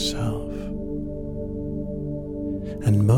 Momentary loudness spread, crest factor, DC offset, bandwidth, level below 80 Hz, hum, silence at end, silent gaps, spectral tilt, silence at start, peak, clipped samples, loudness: 8 LU; 18 dB; under 0.1%; 15.5 kHz; -36 dBFS; 50 Hz at -50 dBFS; 0 s; none; -6.5 dB/octave; 0 s; -6 dBFS; under 0.1%; -29 LUFS